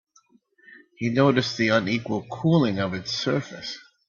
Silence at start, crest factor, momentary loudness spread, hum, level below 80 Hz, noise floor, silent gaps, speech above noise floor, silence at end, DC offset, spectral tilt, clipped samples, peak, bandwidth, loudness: 1 s; 18 dB; 11 LU; none; -62 dBFS; -61 dBFS; none; 38 dB; 0.3 s; under 0.1%; -6 dB/octave; under 0.1%; -6 dBFS; 7.4 kHz; -24 LUFS